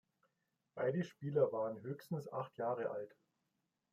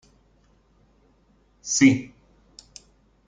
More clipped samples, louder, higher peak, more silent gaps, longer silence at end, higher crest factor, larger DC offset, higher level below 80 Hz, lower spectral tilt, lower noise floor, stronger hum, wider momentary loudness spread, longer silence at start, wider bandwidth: neither; second, -40 LUFS vs -20 LUFS; second, -22 dBFS vs -4 dBFS; neither; second, 0.85 s vs 1.2 s; about the same, 20 dB vs 22 dB; neither; second, -86 dBFS vs -60 dBFS; first, -8 dB/octave vs -3.5 dB/octave; first, -86 dBFS vs -61 dBFS; neither; second, 12 LU vs 28 LU; second, 0.75 s vs 1.65 s; first, 15.5 kHz vs 9.4 kHz